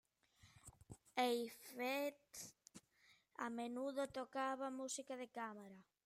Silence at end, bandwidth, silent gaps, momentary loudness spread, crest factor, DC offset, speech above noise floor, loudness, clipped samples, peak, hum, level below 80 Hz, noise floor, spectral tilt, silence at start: 0.25 s; 16 kHz; none; 22 LU; 22 dB; under 0.1%; 29 dB; -46 LUFS; under 0.1%; -26 dBFS; none; -82 dBFS; -75 dBFS; -3 dB/octave; 0.45 s